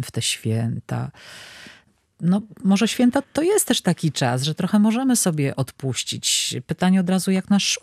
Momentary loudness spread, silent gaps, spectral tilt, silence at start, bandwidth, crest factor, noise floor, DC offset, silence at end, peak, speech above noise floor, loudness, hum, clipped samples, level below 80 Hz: 10 LU; none; -4.5 dB/octave; 0 s; 14.5 kHz; 16 dB; -53 dBFS; under 0.1%; 0.05 s; -6 dBFS; 32 dB; -21 LUFS; none; under 0.1%; -62 dBFS